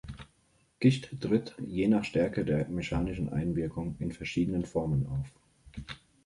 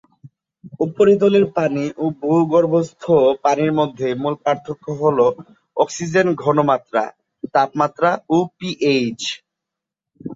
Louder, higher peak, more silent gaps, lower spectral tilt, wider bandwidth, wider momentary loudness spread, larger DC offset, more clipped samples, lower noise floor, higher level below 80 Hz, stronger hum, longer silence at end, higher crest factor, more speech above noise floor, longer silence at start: second, -31 LUFS vs -18 LUFS; second, -10 dBFS vs -2 dBFS; neither; first, -7.5 dB/octave vs -6 dB/octave; first, 11.5 kHz vs 7.8 kHz; first, 17 LU vs 11 LU; neither; neither; second, -69 dBFS vs -84 dBFS; first, -48 dBFS vs -60 dBFS; neither; first, 0.3 s vs 0 s; about the same, 20 dB vs 16 dB; second, 39 dB vs 67 dB; second, 0.05 s vs 0.25 s